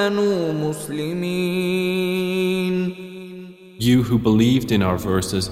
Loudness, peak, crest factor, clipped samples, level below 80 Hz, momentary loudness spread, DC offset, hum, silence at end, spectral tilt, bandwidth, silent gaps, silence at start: -20 LUFS; -4 dBFS; 16 dB; under 0.1%; -46 dBFS; 17 LU; under 0.1%; none; 0 s; -6 dB/octave; 16 kHz; none; 0 s